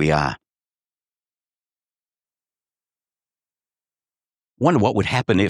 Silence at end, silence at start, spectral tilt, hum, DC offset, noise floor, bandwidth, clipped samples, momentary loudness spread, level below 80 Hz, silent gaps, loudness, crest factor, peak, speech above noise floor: 0 s; 0 s; -6.5 dB/octave; none; under 0.1%; under -90 dBFS; 11 kHz; under 0.1%; 8 LU; -48 dBFS; none; -20 LUFS; 22 dB; -2 dBFS; over 72 dB